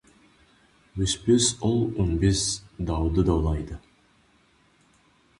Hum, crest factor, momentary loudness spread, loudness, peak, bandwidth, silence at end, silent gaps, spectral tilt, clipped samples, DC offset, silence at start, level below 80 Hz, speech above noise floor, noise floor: none; 18 dB; 11 LU; -24 LUFS; -8 dBFS; 11.5 kHz; 1.6 s; none; -5 dB/octave; under 0.1%; under 0.1%; 0.95 s; -36 dBFS; 38 dB; -62 dBFS